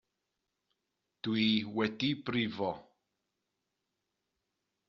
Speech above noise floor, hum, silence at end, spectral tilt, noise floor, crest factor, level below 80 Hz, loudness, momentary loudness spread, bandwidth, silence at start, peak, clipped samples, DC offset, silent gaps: 53 dB; none; 2.05 s; -3.5 dB/octave; -86 dBFS; 22 dB; -74 dBFS; -33 LUFS; 9 LU; 6.8 kHz; 1.25 s; -14 dBFS; under 0.1%; under 0.1%; none